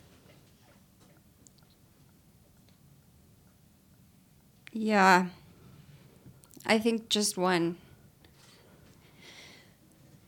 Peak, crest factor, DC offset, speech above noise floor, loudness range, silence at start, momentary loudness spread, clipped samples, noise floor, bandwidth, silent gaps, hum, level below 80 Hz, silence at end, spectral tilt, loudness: -8 dBFS; 26 dB; under 0.1%; 35 dB; 6 LU; 4.75 s; 28 LU; under 0.1%; -61 dBFS; 19 kHz; none; none; -70 dBFS; 2.5 s; -4 dB/octave; -27 LUFS